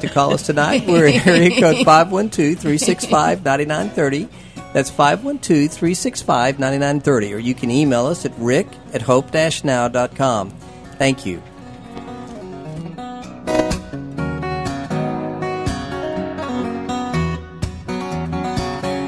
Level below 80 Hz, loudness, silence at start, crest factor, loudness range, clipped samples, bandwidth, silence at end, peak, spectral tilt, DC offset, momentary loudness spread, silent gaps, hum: -40 dBFS; -18 LUFS; 0 s; 18 dB; 10 LU; under 0.1%; 11 kHz; 0 s; 0 dBFS; -5 dB/octave; 0.2%; 18 LU; none; none